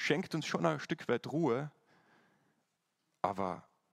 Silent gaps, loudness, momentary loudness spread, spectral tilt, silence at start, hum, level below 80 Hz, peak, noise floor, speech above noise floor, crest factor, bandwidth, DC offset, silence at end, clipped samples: none; -36 LUFS; 6 LU; -5.5 dB/octave; 0 s; none; -78 dBFS; -16 dBFS; -82 dBFS; 47 dB; 22 dB; 13.5 kHz; under 0.1%; 0.3 s; under 0.1%